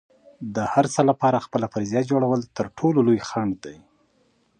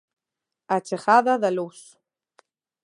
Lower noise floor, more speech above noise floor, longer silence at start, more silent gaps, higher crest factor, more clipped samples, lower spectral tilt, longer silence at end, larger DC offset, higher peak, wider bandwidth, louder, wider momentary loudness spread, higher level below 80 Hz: second, -64 dBFS vs -86 dBFS; second, 42 dB vs 65 dB; second, 0.4 s vs 0.7 s; neither; about the same, 20 dB vs 20 dB; neither; first, -6.5 dB/octave vs -5 dB/octave; second, 0.85 s vs 1.05 s; neither; about the same, -4 dBFS vs -4 dBFS; second, 10 kHz vs 11.5 kHz; about the same, -22 LUFS vs -22 LUFS; about the same, 12 LU vs 11 LU; first, -58 dBFS vs -82 dBFS